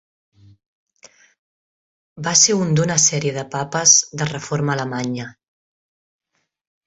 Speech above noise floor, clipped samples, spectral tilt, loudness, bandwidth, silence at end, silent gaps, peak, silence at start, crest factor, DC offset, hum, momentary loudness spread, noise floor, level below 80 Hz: 32 dB; under 0.1%; -2.5 dB/octave; -17 LUFS; 8.4 kHz; 1.55 s; none; 0 dBFS; 2.15 s; 22 dB; under 0.1%; none; 14 LU; -51 dBFS; -58 dBFS